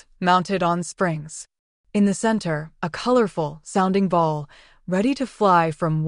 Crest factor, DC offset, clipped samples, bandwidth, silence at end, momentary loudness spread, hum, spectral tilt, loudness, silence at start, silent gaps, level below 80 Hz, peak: 16 dB; under 0.1%; under 0.1%; 11 kHz; 0 s; 12 LU; none; -6 dB/octave; -22 LUFS; 0.2 s; 1.59-1.84 s; -54 dBFS; -6 dBFS